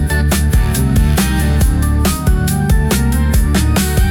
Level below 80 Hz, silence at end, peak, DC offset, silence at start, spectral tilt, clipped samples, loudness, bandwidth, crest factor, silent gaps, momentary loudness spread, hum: -16 dBFS; 0 s; -2 dBFS; under 0.1%; 0 s; -5.5 dB/octave; under 0.1%; -14 LUFS; 17.5 kHz; 10 dB; none; 1 LU; none